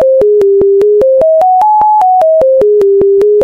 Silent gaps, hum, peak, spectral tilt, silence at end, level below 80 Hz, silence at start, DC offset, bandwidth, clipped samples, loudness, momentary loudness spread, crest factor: none; none; -2 dBFS; -7.5 dB/octave; 0 s; -42 dBFS; 0 s; 0.1%; 4.9 kHz; under 0.1%; -7 LUFS; 0 LU; 4 dB